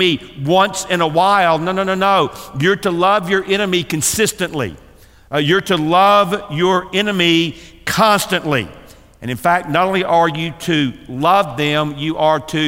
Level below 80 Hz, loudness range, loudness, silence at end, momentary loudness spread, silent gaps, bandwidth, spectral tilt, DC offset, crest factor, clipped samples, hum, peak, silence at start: -48 dBFS; 2 LU; -15 LUFS; 0 s; 8 LU; none; 16 kHz; -4 dB/octave; 0.2%; 14 dB; under 0.1%; none; -2 dBFS; 0 s